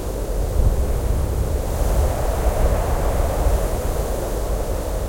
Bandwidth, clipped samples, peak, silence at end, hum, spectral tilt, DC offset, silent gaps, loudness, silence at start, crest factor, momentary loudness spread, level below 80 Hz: 16.5 kHz; under 0.1%; -6 dBFS; 0 s; none; -6 dB/octave; under 0.1%; none; -23 LUFS; 0 s; 14 dB; 4 LU; -22 dBFS